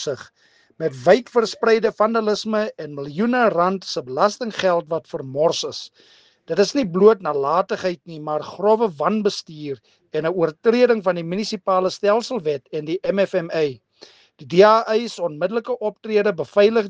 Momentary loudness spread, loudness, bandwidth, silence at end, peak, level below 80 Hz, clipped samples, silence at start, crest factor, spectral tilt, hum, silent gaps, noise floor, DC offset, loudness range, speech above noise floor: 12 LU; -20 LUFS; 9.2 kHz; 0 s; 0 dBFS; -66 dBFS; under 0.1%; 0 s; 20 dB; -5 dB/octave; none; none; -49 dBFS; under 0.1%; 3 LU; 30 dB